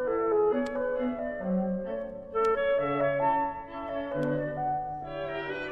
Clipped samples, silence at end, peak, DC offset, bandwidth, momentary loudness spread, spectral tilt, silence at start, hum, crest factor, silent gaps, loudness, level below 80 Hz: under 0.1%; 0 s; -16 dBFS; under 0.1%; 8.4 kHz; 9 LU; -8 dB/octave; 0 s; none; 14 dB; none; -30 LUFS; -56 dBFS